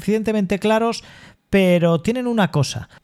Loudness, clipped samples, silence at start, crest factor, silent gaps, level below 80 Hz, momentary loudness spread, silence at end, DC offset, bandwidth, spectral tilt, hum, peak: -19 LUFS; under 0.1%; 0 s; 14 dB; none; -46 dBFS; 7 LU; 0.2 s; under 0.1%; 13.5 kHz; -6 dB/octave; none; -4 dBFS